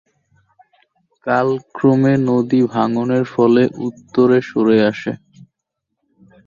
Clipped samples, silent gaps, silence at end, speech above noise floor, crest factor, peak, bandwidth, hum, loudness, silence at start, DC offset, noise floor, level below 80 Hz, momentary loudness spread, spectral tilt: under 0.1%; none; 1.3 s; 62 dB; 16 dB; -2 dBFS; 7.2 kHz; none; -16 LUFS; 1.25 s; under 0.1%; -77 dBFS; -58 dBFS; 11 LU; -8 dB/octave